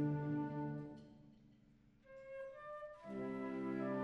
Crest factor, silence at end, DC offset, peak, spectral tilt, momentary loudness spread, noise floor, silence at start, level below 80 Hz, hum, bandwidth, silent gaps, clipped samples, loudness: 16 dB; 0 s; under 0.1%; -30 dBFS; -9.5 dB/octave; 20 LU; -69 dBFS; 0 s; -74 dBFS; none; 6.2 kHz; none; under 0.1%; -45 LUFS